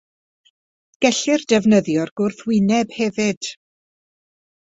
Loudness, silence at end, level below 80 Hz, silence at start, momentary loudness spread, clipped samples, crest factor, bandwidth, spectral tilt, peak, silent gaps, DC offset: -19 LUFS; 1.15 s; -60 dBFS; 1 s; 8 LU; under 0.1%; 20 dB; 8 kHz; -4.5 dB/octave; -2 dBFS; 2.11-2.16 s, 3.37-3.41 s; under 0.1%